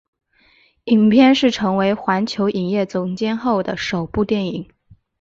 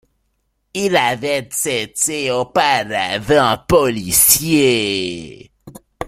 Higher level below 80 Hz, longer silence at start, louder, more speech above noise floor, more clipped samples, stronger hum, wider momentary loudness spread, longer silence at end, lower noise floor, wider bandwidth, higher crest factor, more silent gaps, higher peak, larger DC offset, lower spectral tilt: second, -50 dBFS vs -44 dBFS; about the same, 0.85 s vs 0.75 s; second, -18 LUFS vs -15 LUFS; second, 39 dB vs 51 dB; neither; neither; about the same, 11 LU vs 10 LU; first, 0.55 s vs 0 s; second, -56 dBFS vs -67 dBFS; second, 7.6 kHz vs 16.5 kHz; about the same, 16 dB vs 18 dB; neither; about the same, -2 dBFS vs 0 dBFS; neither; first, -6 dB/octave vs -2.5 dB/octave